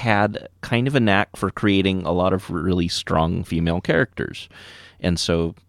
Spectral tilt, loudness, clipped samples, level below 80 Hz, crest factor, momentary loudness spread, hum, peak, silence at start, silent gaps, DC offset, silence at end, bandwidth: -5.5 dB/octave; -21 LUFS; under 0.1%; -42 dBFS; 18 dB; 11 LU; none; -2 dBFS; 0 s; none; under 0.1%; 0.15 s; 14 kHz